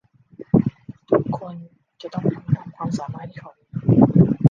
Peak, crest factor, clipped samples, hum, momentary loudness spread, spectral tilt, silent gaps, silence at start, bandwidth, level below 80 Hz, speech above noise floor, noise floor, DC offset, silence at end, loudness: -2 dBFS; 18 dB; under 0.1%; none; 22 LU; -10 dB/octave; none; 0.4 s; 7.4 kHz; -48 dBFS; 17 dB; -43 dBFS; under 0.1%; 0 s; -20 LUFS